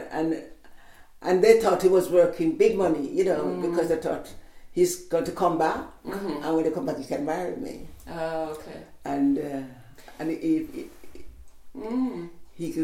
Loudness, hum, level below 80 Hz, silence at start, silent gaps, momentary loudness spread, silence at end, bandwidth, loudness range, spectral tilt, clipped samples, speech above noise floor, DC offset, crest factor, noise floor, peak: -25 LUFS; none; -52 dBFS; 0 s; none; 19 LU; 0 s; 16.5 kHz; 8 LU; -5.5 dB/octave; under 0.1%; 22 dB; under 0.1%; 22 dB; -47 dBFS; -4 dBFS